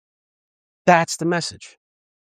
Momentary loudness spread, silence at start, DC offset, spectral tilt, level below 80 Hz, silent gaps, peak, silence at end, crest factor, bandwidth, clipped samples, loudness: 9 LU; 0.85 s; under 0.1%; -4.5 dB/octave; -68 dBFS; none; -2 dBFS; 0.55 s; 22 dB; 15 kHz; under 0.1%; -19 LUFS